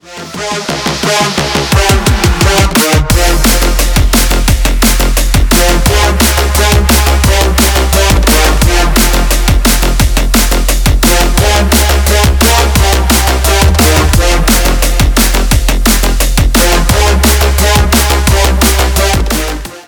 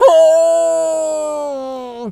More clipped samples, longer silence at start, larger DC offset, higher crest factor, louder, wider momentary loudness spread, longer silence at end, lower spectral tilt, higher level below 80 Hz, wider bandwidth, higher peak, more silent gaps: first, 0.4% vs under 0.1%; about the same, 0.05 s vs 0 s; neither; about the same, 8 dB vs 12 dB; first, -9 LUFS vs -14 LUFS; second, 3 LU vs 16 LU; about the same, 0.05 s vs 0 s; about the same, -3.5 dB/octave vs -3 dB/octave; first, -10 dBFS vs -62 dBFS; first, over 20 kHz vs 12.5 kHz; about the same, 0 dBFS vs 0 dBFS; neither